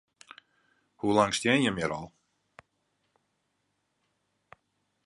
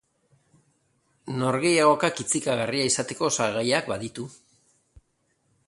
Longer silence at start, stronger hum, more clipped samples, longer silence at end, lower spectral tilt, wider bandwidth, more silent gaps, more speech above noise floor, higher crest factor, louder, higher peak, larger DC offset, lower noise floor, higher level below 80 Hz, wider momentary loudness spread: second, 1.05 s vs 1.25 s; neither; neither; first, 3 s vs 1.35 s; about the same, -4.5 dB/octave vs -3.5 dB/octave; about the same, 11.5 kHz vs 11.5 kHz; neither; first, 51 dB vs 46 dB; about the same, 24 dB vs 22 dB; second, -27 LUFS vs -24 LUFS; about the same, -8 dBFS vs -6 dBFS; neither; first, -78 dBFS vs -71 dBFS; about the same, -64 dBFS vs -64 dBFS; second, 13 LU vs 16 LU